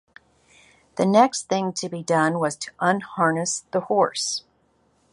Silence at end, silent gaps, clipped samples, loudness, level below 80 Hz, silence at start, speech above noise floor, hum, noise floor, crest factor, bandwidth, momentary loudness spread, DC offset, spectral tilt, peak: 0.75 s; none; under 0.1%; -22 LUFS; -68 dBFS; 0.95 s; 42 dB; none; -64 dBFS; 20 dB; 11.5 kHz; 9 LU; under 0.1%; -4 dB/octave; -2 dBFS